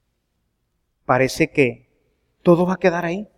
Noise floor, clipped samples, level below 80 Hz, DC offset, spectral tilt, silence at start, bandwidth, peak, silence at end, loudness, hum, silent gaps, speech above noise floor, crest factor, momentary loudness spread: -71 dBFS; under 0.1%; -52 dBFS; under 0.1%; -6.5 dB/octave; 1.1 s; 15 kHz; -2 dBFS; 0.15 s; -19 LUFS; none; none; 53 dB; 20 dB; 6 LU